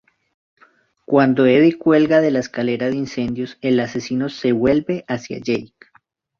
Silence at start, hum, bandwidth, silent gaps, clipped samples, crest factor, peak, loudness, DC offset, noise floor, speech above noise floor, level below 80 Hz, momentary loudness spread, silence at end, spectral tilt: 1.1 s; none; 7 kHz; none; under 0.1%; 16 dB; -2 dBFS; -18 LUFS; under 0.1%; -58 dBFS; 41 dB; -54 dBFS; 10 LU; 0.75 s; -6.5 dB/octave